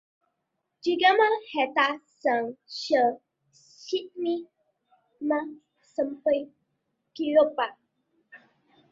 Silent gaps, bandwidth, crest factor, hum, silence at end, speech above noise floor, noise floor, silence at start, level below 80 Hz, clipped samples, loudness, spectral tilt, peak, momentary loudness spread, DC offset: none; 7.6 kHz; 22 dB; none; 0.55 s; 55 dB; -80 dBFS; 0.85 s; -76 dBFS; under 0.1%; -26 LUFS; -3.5 dB/octave; -8 dBFS; 13 LU; under 0.1%